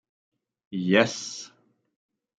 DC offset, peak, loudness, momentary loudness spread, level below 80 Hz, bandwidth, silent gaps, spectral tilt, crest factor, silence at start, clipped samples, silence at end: under 0.1%; -4 dBFS; -24 LUFS; 18 LU; -72 dBFS; 9.2 kHz; none; -4.5 dB/octave; 26 dB; 0.7 s; under 0.1%; 0.9 s